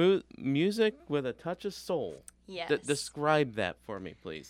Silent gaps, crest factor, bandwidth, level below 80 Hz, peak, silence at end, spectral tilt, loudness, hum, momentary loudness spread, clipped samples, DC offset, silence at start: none; 20 dB; 15.5 kHz; -66 dBFS; -12 dBFS; 0 s; -5 dB/octave; -32 LUFS; none; 14 LU; under 0.1%; under 0.1%; 0 s